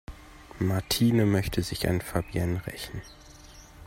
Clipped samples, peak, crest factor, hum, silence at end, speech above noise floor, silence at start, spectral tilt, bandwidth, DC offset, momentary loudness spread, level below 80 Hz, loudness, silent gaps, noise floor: under 0.1%; -10 dBFS; 18 dB; none; 0 s; 22 dB; 0.1 s; -5.5 dB/octave; 16.5 kHz; under 0.1%; 24 LU; -46 dBFS; -28 LUFS; none; -49 dBFS